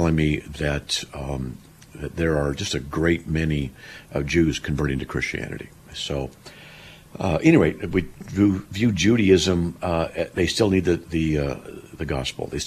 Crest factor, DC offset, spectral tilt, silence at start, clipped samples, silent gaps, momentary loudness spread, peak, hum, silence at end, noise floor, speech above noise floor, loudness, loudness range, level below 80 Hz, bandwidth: 20 dB; under 0.1%; -5.5 dB/octave; 0 s; under 0.1%; none; 17 LU; -4 dBFS; none; 0 s; -45 dBFS; 22 dB; -23 LUFS; 6 LU; -38 dBFS; 14.5 kHz